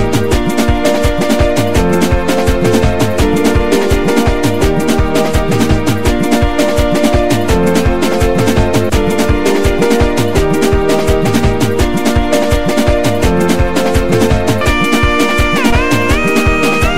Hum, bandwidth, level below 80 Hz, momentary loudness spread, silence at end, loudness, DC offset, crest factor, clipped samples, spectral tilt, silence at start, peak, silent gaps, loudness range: none; 16.5 kHz; -20 dBFS; 2 LU; 0 s; -12 LUFS; 10%; 12 dB; under 0.1%; -5.5 dB/octave; 0 s; 0 dBFS; none; 1 LU